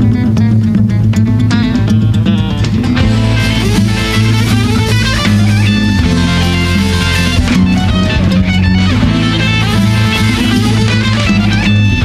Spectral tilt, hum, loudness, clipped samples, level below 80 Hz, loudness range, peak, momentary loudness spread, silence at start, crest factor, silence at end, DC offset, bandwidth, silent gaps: -6 dB/octave; none; -10 LUFS; under 0.1%; -22 dBFS; 1 LU; 0 dBFS; 1 LU; 0 s; 10 dB; 0 s; under 0.1%; 14.5 kHz; none